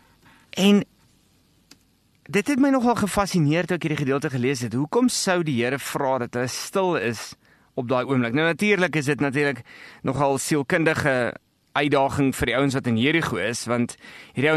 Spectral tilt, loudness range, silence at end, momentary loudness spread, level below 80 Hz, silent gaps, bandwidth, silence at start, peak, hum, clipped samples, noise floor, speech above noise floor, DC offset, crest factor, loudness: -5 dB/octave; 2 LU; 0 s; 9 LU; -52 dBFS; none; 13 kHz; 0.55 s; -6 dBFS; none; under 0.1%; -62 dBFS; 40 dB; under 0.1%; 18 dB; -22 LUFS